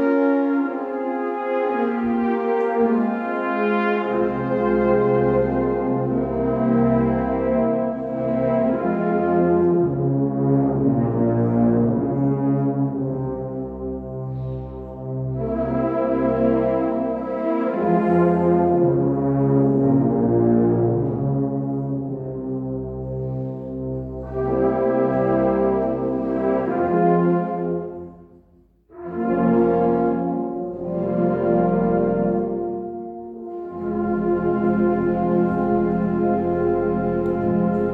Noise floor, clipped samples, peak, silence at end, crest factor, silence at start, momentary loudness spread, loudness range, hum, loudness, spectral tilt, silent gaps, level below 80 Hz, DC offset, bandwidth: -55 dBFS; under 0.1%; -6 dBFS; 0 s; 14 dB; 0 s; 11 LU; 5 LU; none; -21 LUFS; -11.5 dB/octave; none; -44 dBFS; under 0.1%; 4.4 kHz